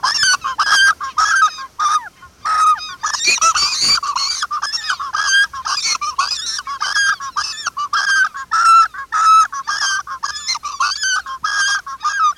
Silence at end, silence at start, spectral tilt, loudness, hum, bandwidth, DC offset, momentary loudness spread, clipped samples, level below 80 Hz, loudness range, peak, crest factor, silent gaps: 0.05 s; 0 s; 2.5 dB/octave; -15 LUFS; none; 16 kHz; under 0.1%; 9 LU; under 0.1%; -54 dBFS; 3 LU; -2 dBFS; 14 dB; none